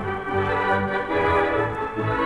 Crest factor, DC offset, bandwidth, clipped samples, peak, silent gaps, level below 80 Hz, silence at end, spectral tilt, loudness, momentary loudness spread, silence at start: 14 dB; under 0.1%; 11 kHz; under 0.1%; -8 dBFS; none; -44 dBFS; 0 s; -7 dB/octave; -23 LUFS; 6 LU; 0 s